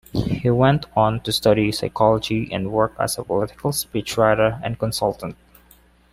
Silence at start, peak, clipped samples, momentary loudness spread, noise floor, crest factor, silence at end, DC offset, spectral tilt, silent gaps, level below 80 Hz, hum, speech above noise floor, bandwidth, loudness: 0.15 s; -2 dBFS; under 0.1%; 7 LU; -53 dBFS; 18 dB; 0.8 s; under 0.1%; -5.5 dB/octave; none; -44 dBFS; none; 33 dB; 16 kHz; -20 LUFS